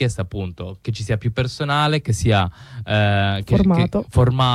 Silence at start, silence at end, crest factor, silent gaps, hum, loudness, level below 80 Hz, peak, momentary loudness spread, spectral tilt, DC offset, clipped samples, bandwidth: 0 s; 0 s; 14 dB; none; none; -19 LUFS; -36 dBFS; -4 dBFS; 11 LU; -6 dB/octave; under 0.1%; under 0.1%; 12.5 kHz